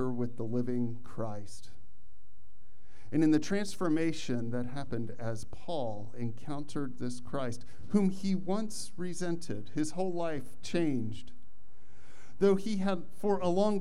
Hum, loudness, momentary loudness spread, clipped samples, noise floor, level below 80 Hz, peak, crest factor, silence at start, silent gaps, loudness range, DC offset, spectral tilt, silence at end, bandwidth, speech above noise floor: none; -34 LUFS; 12 LU; under 0.1%; -65 dBFS; -62 dBFS; -14 dBFS; 20 dB; 0 s; none; 5 LU; 3%; -6.5 dB/octave; 0 s; 13.5 kHz; 31 dB